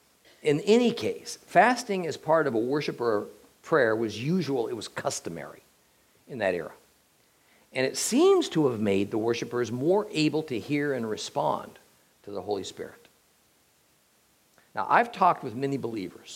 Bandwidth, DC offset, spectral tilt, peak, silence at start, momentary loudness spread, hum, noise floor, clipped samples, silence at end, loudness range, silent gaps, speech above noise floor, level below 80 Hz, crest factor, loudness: 16.5 kHz; under 0.1%; -5 dB/octave; -6 dBFS; 0.45 s; 16 LU; none; -65 dBFS; under 0.1%; 0 s; 9 LU; none; 39 dB; -74 dBFS; 22 dB; -27 LUFS